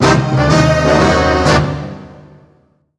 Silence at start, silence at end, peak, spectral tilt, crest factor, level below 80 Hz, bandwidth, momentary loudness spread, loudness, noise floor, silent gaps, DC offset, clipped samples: 0 s; 0.85 s; 0 dBFS; -5.5 dB/octave; 14 dB; -28 dBFS; 11 kHz; 14 LU; -12 LUFS; -53 dBFS; none; under 0.1%; under 0.1%